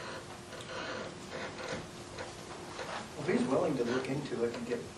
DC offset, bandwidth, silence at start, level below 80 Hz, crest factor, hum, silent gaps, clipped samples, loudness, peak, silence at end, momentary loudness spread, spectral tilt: under 0.1%; 12.5 kHz; 0 s; -64 dBFS; 18 dB; none; none; under 0.1%; -37 LUFS; -18 dBFS; 0 s; 13 LU; -5 dB/octave